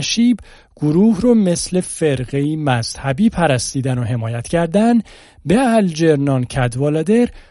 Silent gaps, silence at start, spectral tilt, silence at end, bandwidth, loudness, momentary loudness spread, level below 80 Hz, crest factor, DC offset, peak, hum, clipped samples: none; 0 s; -6 dB/octave; 0.1 s; 11.5 kHz; -16 LUFS; 6 LU; -40 dBFS; 14 dB; under 0.1%; -2 dBFS; none; under 0.1%